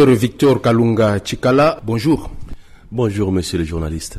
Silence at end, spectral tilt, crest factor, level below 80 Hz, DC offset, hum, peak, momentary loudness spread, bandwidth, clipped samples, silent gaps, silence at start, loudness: 0 s; -6.5 dB/octave; 12 dB; -36 dBFS; under 0.1%; none; -4 dBFS; 8 LU; 13.5 kHz; under 0.1%; none; 0 s; -16 LUFS